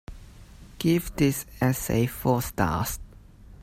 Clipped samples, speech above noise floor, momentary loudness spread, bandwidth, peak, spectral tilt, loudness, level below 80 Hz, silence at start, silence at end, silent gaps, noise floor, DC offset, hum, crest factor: under 0.1%; 23 dB; 6 LU; 16.5 kHz; -8 dBFS; -5.5 dB/octave; -26 LUFS; -44 dBFS; 0.1 s; 0 s; none; -48 dBFS; under 0.1%; none; 18 dB